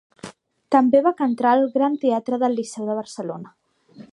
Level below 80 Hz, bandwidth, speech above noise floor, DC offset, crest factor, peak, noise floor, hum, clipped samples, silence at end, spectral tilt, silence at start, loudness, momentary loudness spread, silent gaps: -72 dBFS; 11 kHz; 27 dB; under 0.1%; 18 dB; -2 dBFS; -47 dBFS; none; under 0.1%; 0.1 s; -6 dB/octave; 0.25 s; -20 LUFS; 19 LU; none